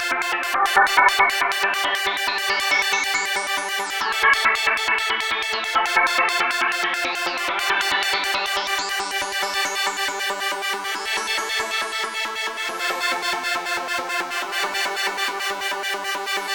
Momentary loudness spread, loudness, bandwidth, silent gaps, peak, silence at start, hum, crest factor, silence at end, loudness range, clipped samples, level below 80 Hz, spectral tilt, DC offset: 7 LU; -21 LUFS; over 20 kHz; none; -2 dBFS; 0 s; none; 20 dB; 0 s; 5 LU; under 0.1%; -60 dBFS; 0.5 dB/octave; under 0.1%